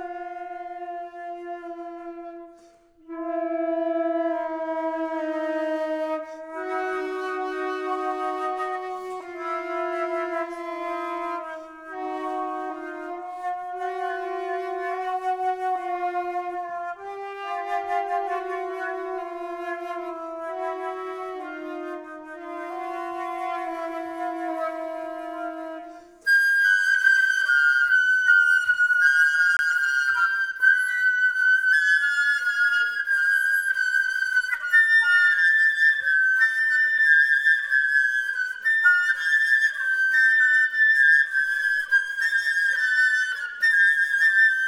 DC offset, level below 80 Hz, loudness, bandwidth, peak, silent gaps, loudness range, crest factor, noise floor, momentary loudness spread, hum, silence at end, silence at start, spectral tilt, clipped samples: under 0.1%; -70 dBFS; -21 LUFS; 18 kHz; -8 dBFS; none; 13 LU; 16 dB; -54 dBFS; 17 LU; none; 0 s; 0 s; -0.5 dB/octave; under 0.1%